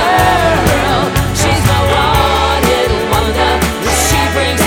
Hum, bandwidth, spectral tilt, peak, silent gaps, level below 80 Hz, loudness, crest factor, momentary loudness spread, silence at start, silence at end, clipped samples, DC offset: none; 19.5 kHz; -4 dB/octave; 0 dBFS; none; -22 dBFS; -11 LUFS; 12 dB; 3 LU; 0 s; 0 s; under 0.1%; under 0.1%